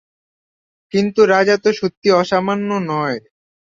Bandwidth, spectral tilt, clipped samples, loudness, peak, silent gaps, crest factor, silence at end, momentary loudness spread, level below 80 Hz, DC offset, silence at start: 7.6 kHz; -5.5 dB/octave; under 0.1%; -16 LUFS; -2 dBFS; 1.97-2.02 s; 16 dB; 0.6 s; 9 LU; -60 dBFS; under 0.1%; 0.95 s